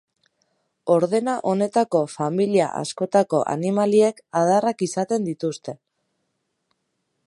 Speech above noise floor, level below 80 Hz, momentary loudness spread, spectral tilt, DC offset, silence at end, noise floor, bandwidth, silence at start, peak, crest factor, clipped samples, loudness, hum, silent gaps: 54 dB; -72 dBFS; 9 LU; -6 dB/octave; under 0.1%; 1.5 s; -75 dBFS; 11.5 kHz; 0.85 s; -4 dBFS; 18 dB; under 0.1%; -21 LUFS; none; none